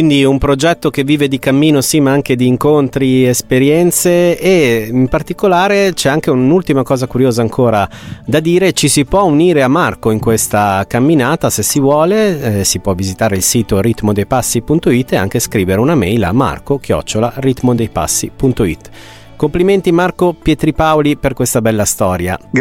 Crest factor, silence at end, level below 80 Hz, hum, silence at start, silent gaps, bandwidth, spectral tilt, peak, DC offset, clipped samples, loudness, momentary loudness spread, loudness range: 12 dB; 0 s; -34 dBFS; none; 0 s; none; 17 kHz; -5 dB/octave; 0 dBFS; under 0.1%; under 0.1%; -12 LUFS; 5 LU; 3 LU